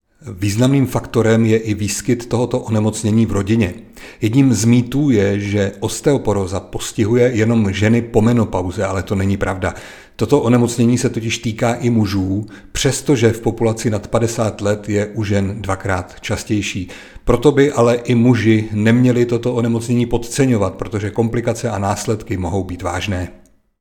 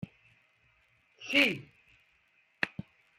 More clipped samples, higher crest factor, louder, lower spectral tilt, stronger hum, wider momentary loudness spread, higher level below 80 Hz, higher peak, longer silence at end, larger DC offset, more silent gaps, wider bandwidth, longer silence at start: neither; second, 16 dB vs 26 dB; first, -17 LUFS vs -29 LUFS; first, -6 dB/octave vs -3.5 dB/octave; neither; second, 9 LU vs 22 LU; first, -38 dBFS vs -72 dBFS; first, 0 dBFS vs -10 dBFS; about the same, 0.45 s vs 0.5 s; neither; neither; first, 18.5 kHz vs 15.5 kHz; first, 0.25 s vs 0 s